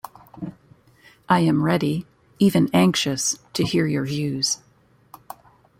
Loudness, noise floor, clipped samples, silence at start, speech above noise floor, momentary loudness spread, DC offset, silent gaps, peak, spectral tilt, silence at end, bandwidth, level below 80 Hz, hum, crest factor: -21 LUFS; -57 dBFS; under 0.1%; 0.35 s; 37 dB; 22 LU; under 0.1%; none; -4 dBFS; -4.5 dB/octave; 1.25 s; 16.5 kHz; -58 dBFS; none; 18 dB